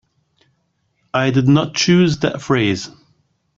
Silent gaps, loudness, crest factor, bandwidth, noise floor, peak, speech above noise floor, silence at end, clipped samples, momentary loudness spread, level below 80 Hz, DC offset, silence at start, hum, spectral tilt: none; -16 LUFS; 16 dB; 7.6 kHz; -66 dBFS; -2 dBFS; 51 dB; 0.7 s; under 0.1%; 10 LU; -52 dBFS; under 0.1%; 1.15 s; none; -5.5 dB/octave